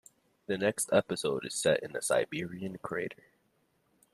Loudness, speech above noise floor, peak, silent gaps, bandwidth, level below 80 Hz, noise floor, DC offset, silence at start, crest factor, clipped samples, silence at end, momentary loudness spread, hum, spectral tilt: -32 LUFS; 41 dB; -12 dBFS; none; 14 kHz; -70 dBFS; -73 dBFS; under 0.1%; 0.5 s; 22 dB; under 0.1%; 1 s; 11 LU; none; -3.5 dB/octave